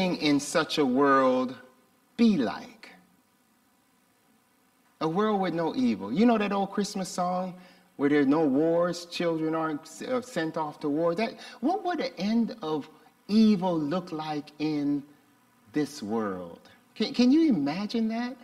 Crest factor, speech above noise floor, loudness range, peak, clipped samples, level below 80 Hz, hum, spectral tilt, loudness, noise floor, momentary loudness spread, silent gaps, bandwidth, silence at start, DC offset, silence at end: 16 dB; 40 dB; 6 LU; -12 dBFS; under 0.1%; -70 dBFS; none; -5.5 dB/octave; -27 LUFS; -66 dBFS; 11 LU; none; 14 kHz; 0 s; under 0.1%; 0.1 s